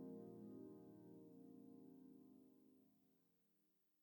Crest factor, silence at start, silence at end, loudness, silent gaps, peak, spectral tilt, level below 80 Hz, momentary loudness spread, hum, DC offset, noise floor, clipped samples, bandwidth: 16 dB; 0 s; 0 s; -62 LUFS; none; -46 dBFS; -9 dB/octave; under -90 dBFS; 9 LU; none; under 0.1%; -84 dBFS; under 0.1%; 19 kHz